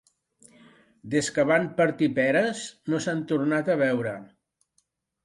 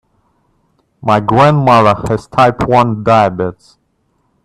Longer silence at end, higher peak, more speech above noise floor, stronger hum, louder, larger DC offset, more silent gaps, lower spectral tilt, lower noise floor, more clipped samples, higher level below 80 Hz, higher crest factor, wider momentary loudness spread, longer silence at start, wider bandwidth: about the same, 1 s vs 0.95 s; second, -8 dBFS vs 0 dBFS; about the same, 48 dB vs 50 dB; neither; second, -25 LUFS vs -11 LUFS; neither; neither; second, -5 dB/octave vs -7 dB/octave; first, -72 dBFS vs -61 dBFS; neither; second, -68 dBFS vs -40 dBFS; first, 18 dB vs 12 dB; about the same, 7 LU vs 9 LU; about the same, 1.05 s vs 1.05 s; about the same, 11.5 kHz vs 12.5 kHz